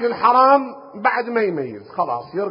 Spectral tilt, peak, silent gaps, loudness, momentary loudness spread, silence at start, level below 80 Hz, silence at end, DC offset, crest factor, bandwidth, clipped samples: -10 dB/octave; -2 dBFS; none; -18 LUFS; 14 LU; 0 s; -66 dBFS; 0 s; under 0.1%; 18 dB; 5.4 kHz; under 0.1%